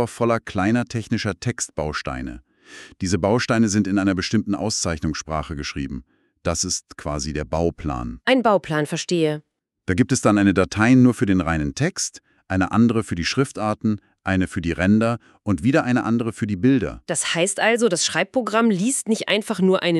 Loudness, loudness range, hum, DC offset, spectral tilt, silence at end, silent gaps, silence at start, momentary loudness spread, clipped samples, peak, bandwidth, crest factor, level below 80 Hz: -21 LUFS; 5 LU; none; under 0.1%; -5 dB/octave; 0 s; none; 0 s; 10 LU; under 0.1%; -4 dBFS; 12.5 kHz; 18 dB; -42 dBFS